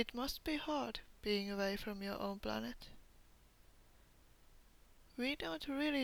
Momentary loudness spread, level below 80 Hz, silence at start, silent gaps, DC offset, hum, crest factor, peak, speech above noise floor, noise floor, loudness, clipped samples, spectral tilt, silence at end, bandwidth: 8 LU; -60 dBFS; 0 s; none; under 0.1%; none; 20 dB; -22 dBFS; 25 dB; -66 dBFS; -41 LUFS; under 0.1%; -4.5 dB/octave; 0 s; over 20 kHz